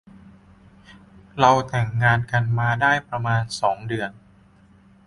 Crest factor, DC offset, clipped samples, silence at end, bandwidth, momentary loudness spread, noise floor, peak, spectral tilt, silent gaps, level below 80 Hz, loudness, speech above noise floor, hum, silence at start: 22 dB; under 0.1%; under 0.1%; 0.95 s; 11.5 kHz; 11 LU; -53 dBFS; -2 dBFS; -5.5 dB/octave; none; -52 dBFS; -21 LUFS; 32 dB; none; 0.9 s